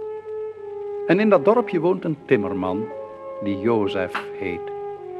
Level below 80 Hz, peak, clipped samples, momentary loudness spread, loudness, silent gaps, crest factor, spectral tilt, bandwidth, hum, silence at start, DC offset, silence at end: -64 dBFS; -4 dBFS; under 0.1%; 15 LU; -23 LUFS; none; 18 dB; -8 dB/octave; 8.6 kHz; none; 0 s; under 0.1%; 0 s